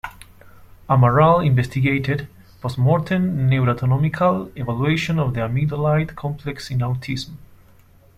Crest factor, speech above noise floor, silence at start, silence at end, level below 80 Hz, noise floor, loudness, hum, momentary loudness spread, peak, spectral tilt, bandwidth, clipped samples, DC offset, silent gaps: 18 dB; 31 dB; 0.05 s; 0.7 s; -44 dBFS; -50 dBFS; -20 LUFS; none; 13 LU; -2 dBFS; -8 dB/octave; 13.5 kHz; under 0.1%; under 0.1%; none